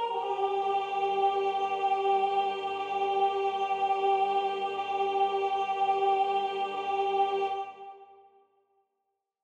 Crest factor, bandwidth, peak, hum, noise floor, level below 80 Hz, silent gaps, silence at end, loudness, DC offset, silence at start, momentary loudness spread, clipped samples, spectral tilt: 12 dB; 7.8 kHz; -16 dBFS; none; -82 dBFS; -90 dBFS; none; 1.3 s; -29 LUFS; under 0.1%; 0 s; 6 LU; under 0.1%; -4 dB/octave